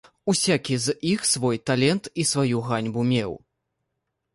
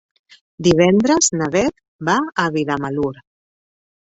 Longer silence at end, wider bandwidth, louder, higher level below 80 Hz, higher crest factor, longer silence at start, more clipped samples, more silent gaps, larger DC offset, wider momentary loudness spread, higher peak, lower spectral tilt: about the same, 0.95 s vs 1.05 s; first, 11.5 kHz vs 8.2 kHz; second, -23 LUFS vs -17 LUFS; second, -60 dBFS vs -50 dBFS; about the same, 18 dB vs 16 dB; second, 0.25 s vs 0.6 s; neither; second, none vs 1.88-1.99 s; neither; second, 4 LU vs 10 LU; second, -8 dBFS vs -2 dBFS; about the same, -4 dB/octave vs -4.5 dB/octave